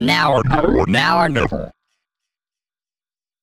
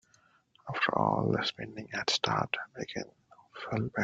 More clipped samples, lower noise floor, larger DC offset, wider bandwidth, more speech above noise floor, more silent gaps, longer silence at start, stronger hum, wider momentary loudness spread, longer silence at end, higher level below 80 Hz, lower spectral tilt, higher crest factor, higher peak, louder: neither; first, under -90 dBFS vs -67 dBFS; neither; first, 16 kHz vs 9.2 kHz; first, over 74 dB vs 34 dB; neither; second, 0 s vs 0.65 s; neither; second, 10 LU vs 16 LU; first, 1.7 s vs 0 s; first, -34 dBFS vs -66 dBFS; first, -6 dB/octave vs -4.5 dB/octave; second, 18 dB vs 24 dB; first, 0 dBFS vs -10 dBFS; first, -16 LUFS vs -32 LUFS